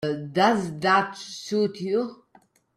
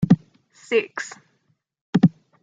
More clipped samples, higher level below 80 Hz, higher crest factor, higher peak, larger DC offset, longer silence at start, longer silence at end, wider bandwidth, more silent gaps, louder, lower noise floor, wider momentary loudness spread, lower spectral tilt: neither; second, -68 dBFS vs -54 dBFS; about the same, 18 dB vs 20 dB; second, -8 dBFS vs -2 dBFS; neither; about the same, 0 s vs 0 s; first, 0.6 s vs 0.35 s; first, 14 kHz vs 7.8 kHz; second, none vs 1.81-1.93 s; about the same, -24 LUFS vs -22 LUFS; second, -60 dBFS vs -69 dBFS; about the same, 11 LU vs 13 LU; second, -5 dB/octave vs -7.5 dB/octave